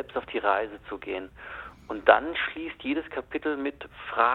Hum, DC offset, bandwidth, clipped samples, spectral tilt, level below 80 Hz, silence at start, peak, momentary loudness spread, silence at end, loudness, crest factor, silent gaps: none; under 0.1%; 4.4 kHz; under 0.1%; -6 dB/octave; -56 dBFS; 0 s; -2 dBFS; 19 LU; 0 s; -28 LUFS; 26 dB; none